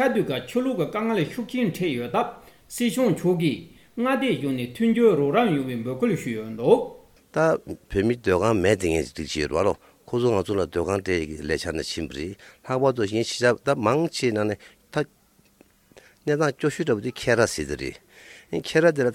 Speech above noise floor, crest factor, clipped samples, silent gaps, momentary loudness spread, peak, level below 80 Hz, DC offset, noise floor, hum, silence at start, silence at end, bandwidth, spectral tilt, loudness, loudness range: 37 dB; 20 dB; under 0.1%; none; 11 LU; -4 dBFS; -50 dBFS; under 0.1%; -60 dBFS; none; 0 s; 0 s; 17 kHz; -5.5 dB/octave; -24 LUFS; 4 LU